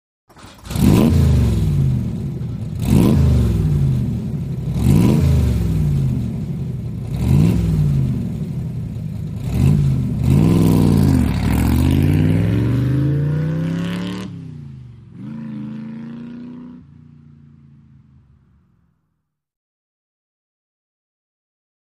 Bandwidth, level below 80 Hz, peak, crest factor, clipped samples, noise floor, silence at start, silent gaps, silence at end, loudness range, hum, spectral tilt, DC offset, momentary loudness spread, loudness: 15.5 kHz; -28 dBFS; -2 dBFS; 16 dB; under 0.1%; -73 dBFS; 0.4 s; none; 5.15 s; 17 LU; none; -8 dB/octave; under 0.1%; 17 LU; -17 LUFS